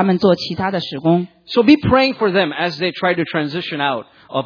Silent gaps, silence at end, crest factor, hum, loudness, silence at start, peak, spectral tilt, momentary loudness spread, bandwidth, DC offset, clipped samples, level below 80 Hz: none; 0 s; 16 dB; none; -17 LUFS; 0 s; 0 dBFS; -7 dB/octave; 8 LU; 5.4 kHz; under 0.1%; under 0.1%; -46 dBFS